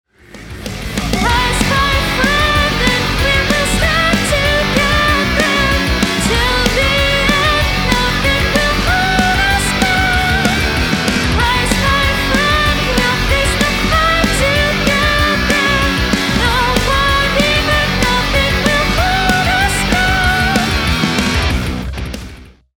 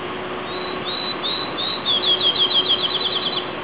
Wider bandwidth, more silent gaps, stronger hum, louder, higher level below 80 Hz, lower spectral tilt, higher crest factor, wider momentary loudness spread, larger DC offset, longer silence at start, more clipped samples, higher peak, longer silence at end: first, over 20 kHz vs 4 kHz; neither; neither; first, -13 LUFS vs -18 LUFS; first, -22 dBFS vs -54 dBFS; first, -4 dB/octave vs 0 dB/octave; about the same, 14 dB vs 14 dB; second, 2 LU vs 12 LU; second, under 0.1% vs 0.4%; first, 0.35 s vs 0 s; neither; first, 0 dBFS vs -8 dBFS; first, 0.35 s vs 0 s